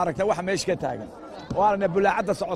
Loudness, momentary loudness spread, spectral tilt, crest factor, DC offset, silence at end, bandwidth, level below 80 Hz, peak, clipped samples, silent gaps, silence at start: -24 LUFS; 14 LU; -5 dB/octave; 16 dB; under 0.1%; 0 s; 14.5 kHz; -52 dBFS; -8 dBFS; under 0.1%; none; 0 s